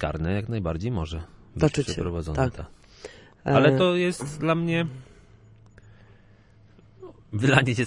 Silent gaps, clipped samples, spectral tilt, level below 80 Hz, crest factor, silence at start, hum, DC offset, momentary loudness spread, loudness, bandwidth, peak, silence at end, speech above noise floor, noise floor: none; under 0.1%; -6 dB/octave; -46 dBFS; 24 dB; 0 s; none; under 0.1%; 23 LU; -25 LUFS; 11.5 kHz; -2 dBFS; 0 s; 30 dB; -54 dBFS